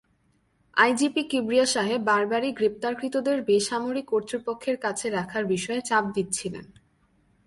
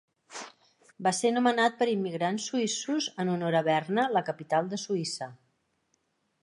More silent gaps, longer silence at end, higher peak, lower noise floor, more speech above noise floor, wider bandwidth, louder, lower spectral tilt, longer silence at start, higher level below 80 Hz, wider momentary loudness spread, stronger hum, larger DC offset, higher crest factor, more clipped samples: neither; second, 0.75 s vs 1.1 s; first, -6 dBFS vs -10 dBFS; second, -67 dBFS vs -75 dBFS; second, 42 dB vs 46 dB; about the same, 11.5 kHz vs 11.5 kHz; first, -25 LUFS vs -28 LUFS; about the same, -3.5 dB/octave vs -4 dB/octave; first, 0.75 s vs 0.3 s; first, -64 dBFS vs -80 dBFS; second, 7 LU vs 17 LU; neither; neither; about the same, 20 dB vs 20 dB; neither